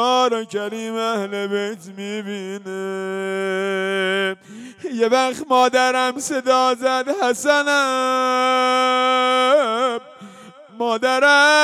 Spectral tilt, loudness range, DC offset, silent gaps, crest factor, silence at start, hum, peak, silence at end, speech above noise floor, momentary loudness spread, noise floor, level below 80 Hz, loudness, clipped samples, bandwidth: -2.5 dB/octave; 7 LU; under 0.1%; none; 14 dB; 0 s; none; -6 dBFS; 0 s; 23 dB; 13 LU; -42 dBFS; -74 dBFS; -19 LUFS; under 0.1%; 15 kHz